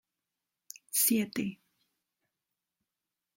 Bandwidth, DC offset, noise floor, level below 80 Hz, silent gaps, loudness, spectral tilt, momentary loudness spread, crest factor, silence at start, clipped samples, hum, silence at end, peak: 16.5 kHz; under 0.1%; -89 dBFS; -80 dBFS; none; -29 LUFS; -3 dB/octave; 24 LU; 22 dB; 0.95 s; under 0.1%; none; 1.8 s; -16 dBFS